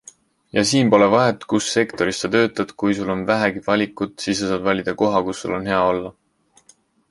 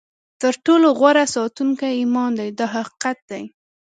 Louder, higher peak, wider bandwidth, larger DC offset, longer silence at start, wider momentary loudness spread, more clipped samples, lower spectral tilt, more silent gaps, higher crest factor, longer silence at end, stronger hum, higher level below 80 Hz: about the same, -19 LUFS vs -18 LUFS; about the same, -2 dBFS vs -2 dBFS; first, 11.5 kHz vs 9.4 kHz; neither; first, 0.55 s vs 0.4 s; second, 10 LU vs 14 LU; neither; about the same, -4.5 dB/octave vs -3.5 dB/octave; second, none vs 3.22-3.28 s; about the same, 18 dB vs 18 dB; first, 1 s vs 0.5 s; neither; first, -52 dBFS vs -70 dBFS